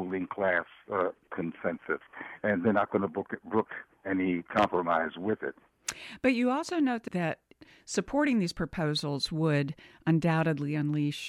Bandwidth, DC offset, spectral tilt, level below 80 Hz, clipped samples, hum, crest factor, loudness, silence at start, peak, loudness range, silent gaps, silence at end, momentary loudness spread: 12.5 kHz; under 0.1%; -6 dB/octave; -60 dBFS; under 0.1%; none; 18 dB; -30 LUFS; 0 s; -12 dBFS; 2 LU; none; 0 s; 10 LU